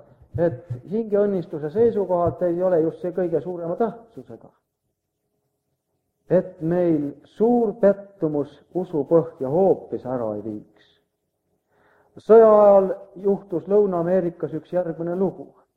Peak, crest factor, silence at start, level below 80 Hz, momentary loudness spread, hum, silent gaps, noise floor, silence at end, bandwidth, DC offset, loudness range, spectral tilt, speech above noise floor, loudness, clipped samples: -4 dBFS; 18 dB; 0.35 s; -58 dBFS; 14 LU; none; none; -77 dBFS; 0.3 s; 4.6 kHz; under 0.1%; 9 LU; -10.5 dB/octave; 56 dB; -21 LUFS; under 0.1%